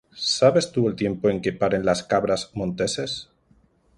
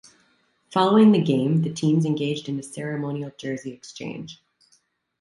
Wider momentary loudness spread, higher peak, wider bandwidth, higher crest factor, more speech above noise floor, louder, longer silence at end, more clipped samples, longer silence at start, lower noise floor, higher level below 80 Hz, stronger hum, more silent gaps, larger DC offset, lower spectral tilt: second, 9 LU vs 19 LU; about the same, -4 dBFS vs -6 dBFS; about the same, 11.5 kHz vs 11.5 kHz; about the same, 20 dB vs 18 dB; second, 38 dB vs 43 dB; about the same, -23 LUFS vs -22 LUFS; second, 0.75 s vs 0.9 s; neither; second, 0.15 s vs 0.7 s; second, -60 dBFS vs -65 dBFS; first, -52 dBFS vs -66 dBFS; neither; neither; neither; second, -4.5 dB/octave vs -7 dB/octave